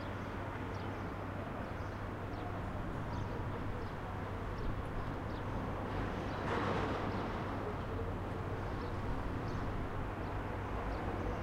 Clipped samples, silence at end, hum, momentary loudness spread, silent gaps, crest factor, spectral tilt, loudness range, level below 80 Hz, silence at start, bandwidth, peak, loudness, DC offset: under 0.1%; 0 s; none; 5 LU; none; 16 dB; -7.5 dB/octave; 3 LU; -46 dBFS; 0 s; 15 kHz; -22 dBFS; -41 LUFS; under 0.1%